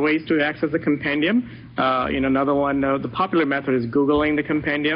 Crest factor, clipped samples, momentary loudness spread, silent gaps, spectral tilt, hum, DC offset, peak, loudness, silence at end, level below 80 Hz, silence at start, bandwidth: 12 dB; under 0.1%; 3 LU; none; -4 dB/octave; none; under 0.1%; -8 dBFS; -21 LUFS; 0 s; -46 dBFS; 0 s; 5.4 kHz